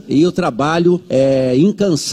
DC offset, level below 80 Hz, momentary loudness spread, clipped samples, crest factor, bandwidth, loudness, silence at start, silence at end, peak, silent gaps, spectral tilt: under 0.1%; -48 dBFS; 3 LU; under 0.1%; 10 dB; 13.5 kHz; -14 LUFS; 0.05 s; 0 s; -4 dBFS; none; -6 dB/octave